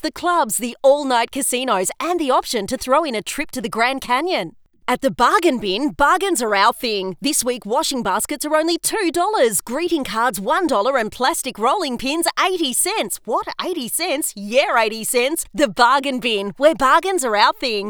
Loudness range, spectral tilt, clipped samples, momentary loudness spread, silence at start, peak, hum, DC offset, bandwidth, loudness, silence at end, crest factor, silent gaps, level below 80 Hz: 3 LU; -2 dB/octave; under 0.1%; 7 LU; 0.05 s; 0 dBFS; none; under 0.1%; over 20 kHz; -18 LUFS; 0 s; 18 dB; none; -48 dBFS